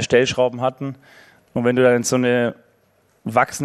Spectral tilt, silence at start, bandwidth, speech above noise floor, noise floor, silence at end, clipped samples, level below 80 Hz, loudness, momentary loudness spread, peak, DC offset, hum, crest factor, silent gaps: -4.5 dB/octave; 0 s; 13.5 kHz; 42 dB; -60 dBFS; 0 s; under 0.1%; -58 dBFS; -19 LUFS; 14 LU; -2 dBFS; under 0.1%; none; 18 dB; none